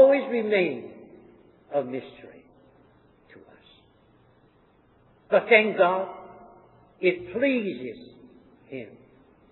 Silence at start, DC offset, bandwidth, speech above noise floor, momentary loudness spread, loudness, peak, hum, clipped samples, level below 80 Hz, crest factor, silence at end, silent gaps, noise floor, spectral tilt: 0 s; under 0.1%; 4.2 kHz; 36 dB; 26 LU; -24 LUFS; -4 dBFS; none; under 0.1%; -70 dBFS; 22 dB; 0.6 s; none; -60 dBFS; -9 dB/octave